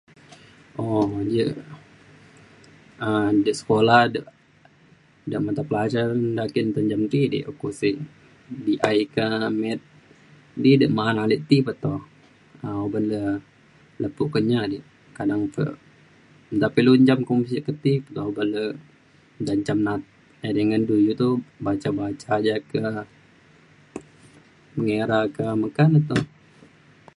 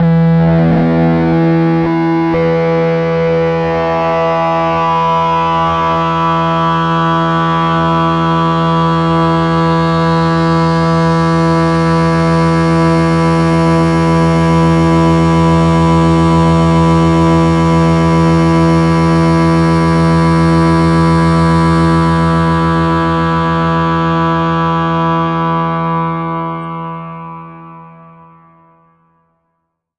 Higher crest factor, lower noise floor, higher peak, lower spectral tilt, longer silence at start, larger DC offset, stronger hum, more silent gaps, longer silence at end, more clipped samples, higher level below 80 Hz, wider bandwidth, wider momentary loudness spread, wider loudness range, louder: first, 22 dB vs 10 dB; second, -55 dBFS vs -69 dBFS; about the same, -2 dBFS vs -2 dBFS; about the same, -7.5 dB/octave vs -7.5 dB/octave; first, 0.75 s vs 0 s; neither; neither; neither; second, 0.9 s vs 2.1 s; neither; second, -58 dBFS vs -32 dBFS; about the same, 11 kHz vs 10.5 kHz; first, 15 LU vs 4 LU; about the same, 5 LU vs 5 LU; second, -23 LUFS vs -11 LUFS